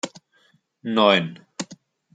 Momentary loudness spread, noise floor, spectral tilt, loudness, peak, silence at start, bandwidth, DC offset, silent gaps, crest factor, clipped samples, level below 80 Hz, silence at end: 19 LU; -62 dBFS; -4 dB/octave; -20 LUFS; -2 dBFS; 0.05 s; 9.4 kHz; under 0.1%; none; 22 dB; under 0.1%; -74 dBFS; 0.4 s